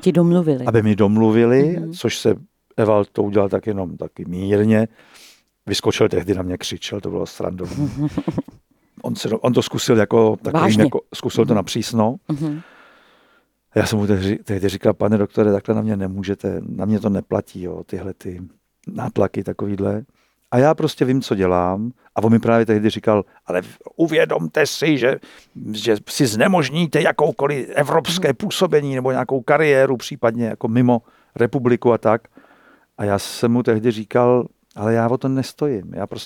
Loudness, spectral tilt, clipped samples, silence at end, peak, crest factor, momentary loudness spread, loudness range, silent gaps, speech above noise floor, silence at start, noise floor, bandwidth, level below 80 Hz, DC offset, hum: -19 LUFS; -6 dB/octave; under 0.1%; 0 s; 0 dBFS; 18 dB; 11 LU; 5 LU; none; 41 dB; 0 s; -59 dBFS; 18 kHz; -58 dBFS; under 0.1%; none